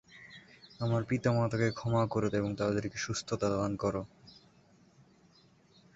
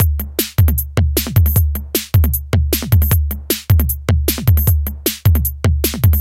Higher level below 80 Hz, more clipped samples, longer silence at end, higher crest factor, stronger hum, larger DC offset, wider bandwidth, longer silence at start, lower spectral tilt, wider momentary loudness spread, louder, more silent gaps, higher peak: second, -60 dBFS vs -20 dBFS; neither; first, 1.65 s vs 0 s; about the same, 18 dB vs 14 dB; neither; neither; second, 8 kHz vs 17 kHz; about the same, 0.1 s vs 0 s; about the same, -6 dB/octave vs -5 dB/octave; first, 20 LU vs 4 LU; second, -32 LUFS vs -16 LUFS; neither; second, -16 dBFS vs 0 dBFS